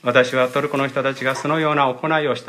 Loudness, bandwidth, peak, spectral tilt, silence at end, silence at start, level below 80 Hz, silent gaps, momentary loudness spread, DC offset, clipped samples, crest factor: -19 LUFS; 15 kHz; 0 dBFS; -5 dB/octave; 0 s; 0.05 s; -68 dBFS; none; 5 LU; under 0.1%; under 0.1%; 18 dB